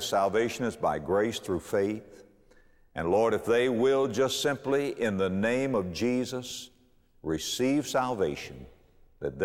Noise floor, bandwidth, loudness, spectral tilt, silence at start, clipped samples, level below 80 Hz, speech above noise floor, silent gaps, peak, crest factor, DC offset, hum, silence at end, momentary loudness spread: -62 dBFS; 16.5 kHz; -28 LUFS; -4.5 dB/octave; 0 s; under 0.1%; -58 dBFS; 34 dB; none; -14 dBFS; 14 dB; under 0.1%; none; 0 s; 14 LU